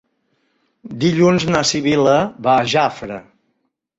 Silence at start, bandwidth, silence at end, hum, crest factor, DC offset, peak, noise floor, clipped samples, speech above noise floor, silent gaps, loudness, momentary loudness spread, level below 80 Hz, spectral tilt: 0.85 s; 8 kHz; 0.75 s; none; 16 dB; under 0.1%; -2 dBFS; -70 dBFS; under 0.1%; 54 dB; none; -16 LUFS; 16 LU; -52 dBFS; -5 dB/octave